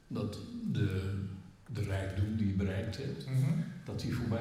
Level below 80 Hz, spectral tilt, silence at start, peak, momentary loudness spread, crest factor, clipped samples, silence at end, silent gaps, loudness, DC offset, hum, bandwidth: -58 dBFS; -7.5 dB/octave; 0.1 s; -20 dBFS; 8 LU; 14 dB; under 0.1%; 0 s; none; -36 LUFS; under 0.1%; none; 14 kHz